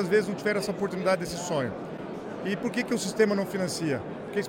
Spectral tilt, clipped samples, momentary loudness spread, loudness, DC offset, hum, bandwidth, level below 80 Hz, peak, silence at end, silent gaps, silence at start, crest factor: -5 dB/octave; under 0.1%; 10 LU; -29 LUFS; under 0.1%; none; 16.5 kHz; -62 dBFS; -10 dBFS; 0 s; none; 0 s; 18 dB